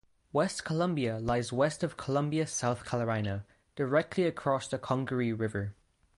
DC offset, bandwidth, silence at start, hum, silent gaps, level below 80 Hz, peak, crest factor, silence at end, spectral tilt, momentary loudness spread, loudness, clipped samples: under 0.1%; 11.5 kHz; 0.35 s; none; none; -58 dBFS; -14 dBFS; 18 dB; 0.45 s; -5.5 dB/octave; 6 LU; -32 LUFS; under 0.1%